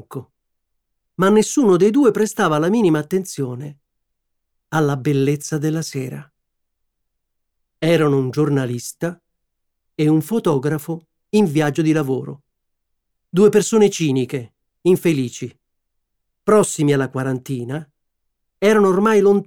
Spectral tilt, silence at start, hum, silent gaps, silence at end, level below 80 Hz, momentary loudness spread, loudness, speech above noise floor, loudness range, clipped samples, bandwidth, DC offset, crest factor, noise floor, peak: -6 dB/octave; 0.1 s; none; none; 0.05 s; -60 dBFS; 15 LU; -18 LUFS; 57 dB; 6 LU; under 0.1%; 17.5 kHz; under 0.1%; 16 dB; -74 dBFS; -2 dBFS